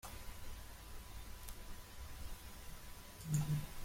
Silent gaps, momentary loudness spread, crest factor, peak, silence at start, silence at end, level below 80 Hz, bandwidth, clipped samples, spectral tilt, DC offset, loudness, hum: none; 14 LU; 22 dB; -24 dBFS; 0.05 s; 0 s; -52 dBFS; 16.5 kHz; under 0.1%; -5 dB/octave; under 0.1%; -47 LUFS; none